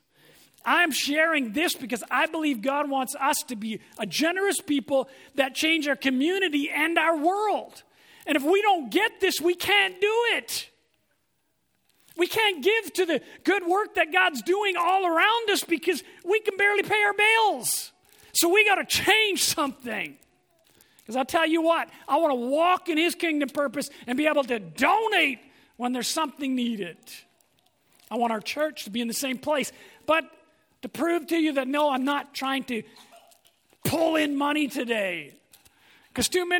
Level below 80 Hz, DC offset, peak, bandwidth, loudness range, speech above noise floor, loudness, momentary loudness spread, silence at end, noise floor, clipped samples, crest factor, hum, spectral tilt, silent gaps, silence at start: -66 dBFS; under 0.1%; -6 dBFS; over 20 kHz; 6 LU; 49 dB; -24 LUFS; 11 LU; 0 s; -74 dBFS; under 0.1%; 20 dB; none; -2 dB/octave; none; 0.65 s